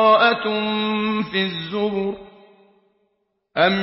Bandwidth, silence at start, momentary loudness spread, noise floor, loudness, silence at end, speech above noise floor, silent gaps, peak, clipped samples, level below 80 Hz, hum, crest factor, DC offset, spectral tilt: 5.8 kHz; 0 s; 11 LU; -71 dBFS; -21 LUFS; 0 s; 52 dB; none; -2 dBFS; under 0.1%; -60 dBFS; none; 18 dB; under 0.1%; -9.5 dB/octave